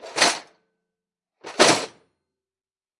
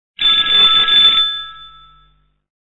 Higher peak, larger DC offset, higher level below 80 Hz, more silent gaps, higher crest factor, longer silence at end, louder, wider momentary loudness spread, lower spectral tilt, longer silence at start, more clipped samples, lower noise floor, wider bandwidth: about the same, -2 dBFS vs -2 dBFS; neither; second, -68 dBFS vs -48 dBFS; neither; first, 24 dB vs 14 dB; about the same, 1.1 s vs 1.05 s; second, -19 LUFS vs -9 LUFS; first, 18 LU vs 14 LU; about the same, -1.5 dB/octave vs -1 dB/octave; second, 0.05 s vs 0.2 s; neither; first, under -90 dBFS vs -55 dBFS; first, 11.5 kHz vs 8 kHz